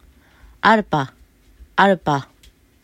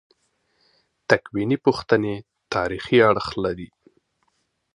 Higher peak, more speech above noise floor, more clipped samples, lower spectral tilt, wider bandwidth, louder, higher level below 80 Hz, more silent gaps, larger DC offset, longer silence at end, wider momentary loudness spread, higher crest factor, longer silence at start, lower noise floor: about the same, 0 dBFS vs 0 dBFS; second, 36 dB vs 50 dB; neither; about the same, -6 dB/octave vs -6 dB/octave; first, 15 kHz vs 10.5 kHz; first, -18 LUFS vs -21 LUFS; about the same, -50 dBFS vs -52 dBFS; neither; neither; second, 0.6 s vs 1.1 s; second, 9 LU vs 18 LU; about the same, 20 dB vs 24 dB; second, 0.65 s vs 1.1 s; second, -52 dBFS vs -71 dBFS